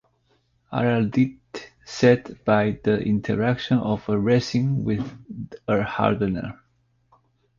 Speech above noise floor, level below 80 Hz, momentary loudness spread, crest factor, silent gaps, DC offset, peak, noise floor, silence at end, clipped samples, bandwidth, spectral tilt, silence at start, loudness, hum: 44 dB; -52 dBFS; 16 LU; 20 dB; none; under 0.1%; -4 dBFS; -66 dBFS; 1.05 s; under 0.1%; 7.4 kHz; -7 dB/octave; 0.7 s; -23 LUFS; none